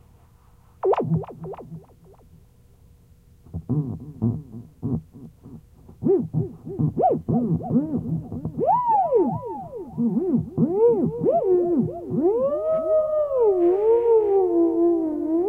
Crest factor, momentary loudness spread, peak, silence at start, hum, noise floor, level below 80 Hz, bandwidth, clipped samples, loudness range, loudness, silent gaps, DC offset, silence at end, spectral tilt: 14 dB; 15 LU; -10 dBFS; 0.85 s; none; -53 dBFS; -52 dBFS; 3.3 kHz; under 0.1%; 11 LU; -22 LUFS; none; under 0.1%; 0 s; -12 dB/octave